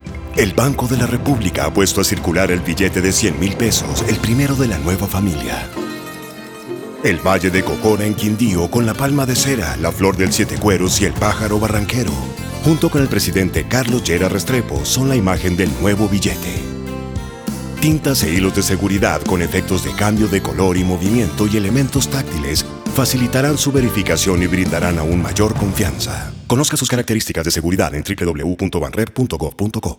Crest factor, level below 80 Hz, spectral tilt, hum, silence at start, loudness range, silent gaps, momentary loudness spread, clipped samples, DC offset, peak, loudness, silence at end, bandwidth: 16 dB; -32 dBFS; -4.5 dB/octave; none; 0.05 s; 2 LU; none; 7 LU; under 0.1%; under 0.1%; 0 dBFS; -17 LUFS; 0.05 s; over 20 kHz